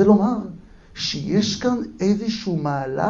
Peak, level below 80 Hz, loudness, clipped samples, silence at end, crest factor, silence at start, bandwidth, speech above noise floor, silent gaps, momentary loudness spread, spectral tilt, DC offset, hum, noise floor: -2 dBFS; -50 dBFS; -22 LUFS; under 0.1%; 0 s; 18 dB; 0 s; 7.6 kHz; 20 dB; none; 9 LU; -6 dB/octave; under 0.1%; none; -40 dBFS